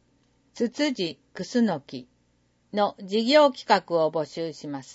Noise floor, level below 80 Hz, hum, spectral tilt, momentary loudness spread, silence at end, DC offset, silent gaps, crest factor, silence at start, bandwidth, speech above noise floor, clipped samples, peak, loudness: -67 dBFS; -72 dBFS; 60 Hz at -50 dBFS; -5 dB/octave; 15 LU; 0 s; under 0.1%; none; 20 dB; 0.55 s; 8 kHz; 42 dB; under 0.1%; -6 dBFS; -25 LUFS